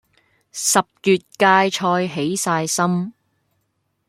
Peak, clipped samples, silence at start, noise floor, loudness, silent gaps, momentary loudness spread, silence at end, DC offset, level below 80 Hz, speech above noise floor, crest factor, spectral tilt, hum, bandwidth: -2 dBFS; under 0.1%; 0.55 s; -71 dBFS; -18 LUFS; none; 8 LU; 1 s; under 0.1%; -66 dBFS; 52 dB; 18 dB; -3.5 dB/octave; none; 16.5 kHz